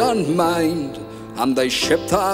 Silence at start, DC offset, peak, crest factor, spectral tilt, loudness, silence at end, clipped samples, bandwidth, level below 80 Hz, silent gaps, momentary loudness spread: 0 s; under 0.1%; -2 dBFS; 16 dB; -4.5 dB/octave; -19 LUFS; 0 s; under 0.1%; 16 kHz; -46 dBFS; none; 12 LU